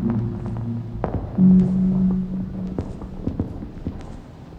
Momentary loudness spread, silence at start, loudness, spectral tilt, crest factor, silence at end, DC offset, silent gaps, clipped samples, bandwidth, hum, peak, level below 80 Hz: 18 LU; 0 s; -22 LUFS; -11 dB/octave; 16 dB; 0 s; under 0.1%; none; under 0.1%; 3.2 kHz; none; -6 dBFS; -36 dBFS